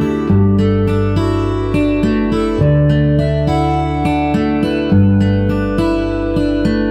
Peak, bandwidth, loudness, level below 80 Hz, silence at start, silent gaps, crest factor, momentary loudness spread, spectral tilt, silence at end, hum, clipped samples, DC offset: -2 dBFS; 9.4 kHz; -14 LUFS; -26 dBFS; 0 s; none; 12 dB; 4 LU; -8.5 dB/octave; 0 s; none; under 0.1%; under 0.1%